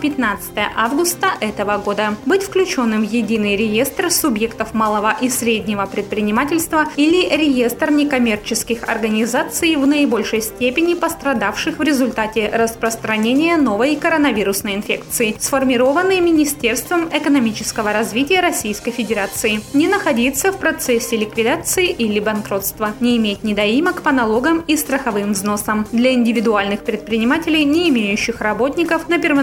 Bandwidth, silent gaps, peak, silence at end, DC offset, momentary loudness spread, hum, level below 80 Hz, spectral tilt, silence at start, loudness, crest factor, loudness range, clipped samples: 18 kHz; none; -2 dBFS; 0 s; under 0.1%; 5 LU; none; -44 dBFS; -3.5 dB/octave; 0 s; -17 LUFS; 16 dB; 1 LU; under 0.1%